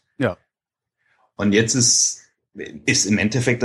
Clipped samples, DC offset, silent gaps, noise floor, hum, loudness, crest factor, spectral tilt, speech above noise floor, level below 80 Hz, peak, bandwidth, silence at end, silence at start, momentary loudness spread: under 0.1%; under 0.1%; none; -86 dBFS; none; -18 LUFS; 18 dB; -3 dB/octave; 68 dB; -56 dBFS; -4 dBFS; 12.5 kHz; 0 s; 0.2 s; 21 LU